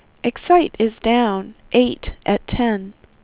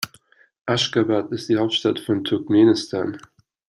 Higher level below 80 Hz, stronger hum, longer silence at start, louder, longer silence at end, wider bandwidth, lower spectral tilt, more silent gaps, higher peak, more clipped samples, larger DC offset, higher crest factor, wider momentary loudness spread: first, -38 dBFS vs -64 dBFS; neither; first, 0.25 s vs 0 s; about the same, -19 LUFS vs -20 LUFS; second, 0.3 s vs 0.5 s; second, 4 kHz vs 15.5 kHz; first, -10 dB/octave vs -5 dB/octave; second, none vs 0.61-0.65 s; about the same, -2 dBFS vs -4 dBFS; neither; neither; about the same, 16 dB vs 16 dB; second, 11 LU vs 14 LU